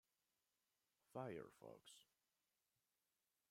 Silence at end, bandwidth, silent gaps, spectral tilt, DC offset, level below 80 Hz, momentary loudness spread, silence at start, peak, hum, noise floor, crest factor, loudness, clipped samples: 1.45 s; 16 kHz; none; -5.5 dB/octave; under 0.1%; under -90 dBFS; 14 LU; 1.1 s; -36 dBFS; none; under -90 dBFS; 26 dB; -57 LUFS; under 0.1%